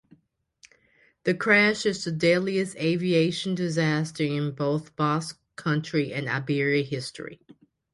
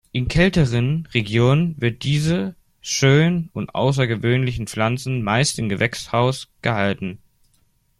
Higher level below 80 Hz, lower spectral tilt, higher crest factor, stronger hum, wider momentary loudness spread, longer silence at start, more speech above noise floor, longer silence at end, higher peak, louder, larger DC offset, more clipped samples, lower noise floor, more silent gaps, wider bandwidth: second, -66 dBFS vs -40 dBFS; about the same, -5.5 dB/octave vs -5.5 dB/octave; about the same, 20 dB vs 18 dB; neither; first, 11 LU vs 8 LU; first, 1.25 s vs 0.15 s; about the same, 39 dB vs 42 dB; second, 0.6 s vs 0.85 s; second, -6 dBFS vs -2 dBFS; second, -25 LUFS vs -20 LUFS; neither; neither; about the same, -64 dBFS vs -62 dBFS; neither; second, 11.5 kHz vs 13.5 kHz